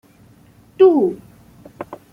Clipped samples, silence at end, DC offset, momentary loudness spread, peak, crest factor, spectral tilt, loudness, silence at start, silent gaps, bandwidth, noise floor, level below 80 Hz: under 0.1%; 0.15 s; under 0.1%; 23 LU; -2 dBFS; 16 dB; -8 dB/octave; -15 LUFS; 0.8 s; none; 4.8 kHz; -49 dBFS; -60 dBFS